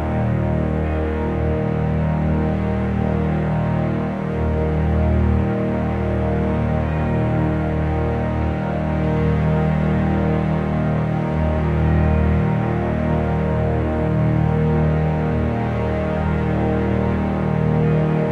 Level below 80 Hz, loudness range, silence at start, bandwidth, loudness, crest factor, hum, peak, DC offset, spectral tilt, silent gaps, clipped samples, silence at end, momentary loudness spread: -28 dBFS; 2 LU; 0 s; 5 kHz; -20 LUFS; 12 dB; none; -6 dBFS; under 0.1%; -10 dB/octave; none; under 0.1%; 0 s; 3 LU